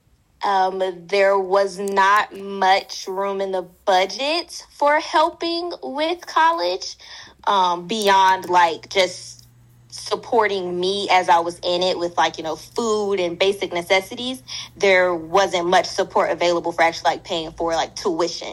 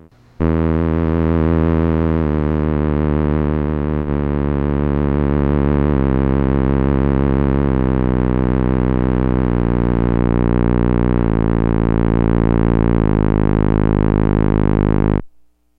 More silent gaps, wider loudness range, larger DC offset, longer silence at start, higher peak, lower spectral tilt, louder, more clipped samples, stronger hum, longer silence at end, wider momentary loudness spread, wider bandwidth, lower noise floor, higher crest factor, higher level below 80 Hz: neither; about the same, 2 LU vs 2 LU; neither; about the same, 0.4 s vs 0.4 s; about the same, -2 dBFS vs -2 dBFS; second, -3 dB/octave vs -12 dB/octave; second, -20 LUFS vs -16 LUFS; neither; neither; second, 0 s vs 0.5 s; first, 11 LU vs 3 LU; first, 16 kHz vs 4.5 kHz; about the same, -50 dBFS vs -50 dBFS; about the same, 18 dB vs 14 dB; second, -56 dBFS vs -22 dBFS